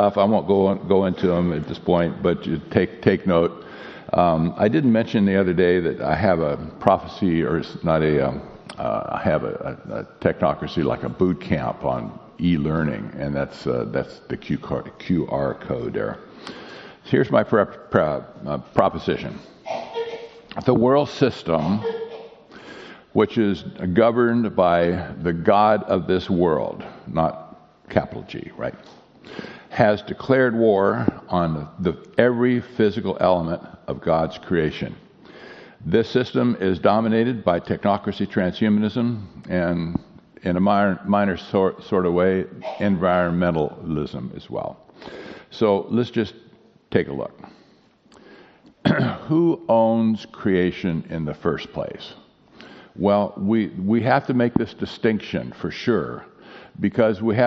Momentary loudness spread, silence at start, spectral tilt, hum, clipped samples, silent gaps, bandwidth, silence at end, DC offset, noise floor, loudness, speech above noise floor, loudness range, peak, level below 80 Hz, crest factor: 14 LU; 0 s; -6 dB/octave; none; under 0.1%; none; 6.6 kHz; 0 s; under 0.1%; -55 dBFS; -22 LUFS; 35 dB; 6 LU; 0 dBFS; -48 dBFS; 22 dB